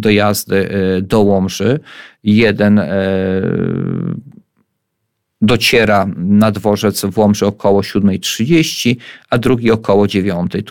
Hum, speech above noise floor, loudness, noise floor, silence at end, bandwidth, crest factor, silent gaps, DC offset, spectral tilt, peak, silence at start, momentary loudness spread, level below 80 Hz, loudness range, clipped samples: none; 58 dB; -14 LUFS; -71 dBFS; 0 s; 17.5 kHz; 12 dB; none; under 0.1%; -5.5 dB/octave; 0 dBFS; 0 s; 8 LU; -44 dBFS; 3 LU; under 0.1%